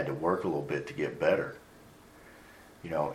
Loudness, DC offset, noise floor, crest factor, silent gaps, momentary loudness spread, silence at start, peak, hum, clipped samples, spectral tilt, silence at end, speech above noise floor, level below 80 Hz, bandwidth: -32 LUFS; under 0.1%; -55 dBFS; 20 dB; none; 24 LU; 0 s; -14 dBFS; none; under 0.1%; -7 dB/octave; 0 s; 24 dB; -64 dBFS; 16 kHz